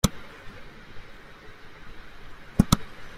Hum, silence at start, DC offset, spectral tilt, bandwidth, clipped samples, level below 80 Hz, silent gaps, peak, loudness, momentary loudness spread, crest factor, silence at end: none; 0.05 s; under 0.1%; -5 dB/octave; 16 kHz; under 0.1%; -38 dBFS; none; -2 dBFS; -25 LUFS; 24 LU; 28 dB; 0 s